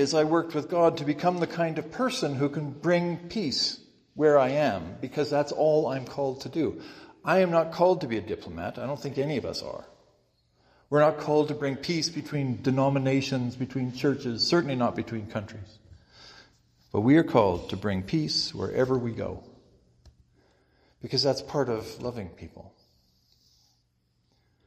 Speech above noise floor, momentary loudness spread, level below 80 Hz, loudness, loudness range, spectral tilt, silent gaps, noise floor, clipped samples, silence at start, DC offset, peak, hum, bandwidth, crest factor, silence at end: 44 dB; 13 LU; -62 dBFS; -27 LUFS; 6 LU; -5.5 dB/octave; none; -71 dBFS; under 0.1%; 0 s; under 0.1%; -6 dBFS; none; 15 kHz; 22 dB; 2 s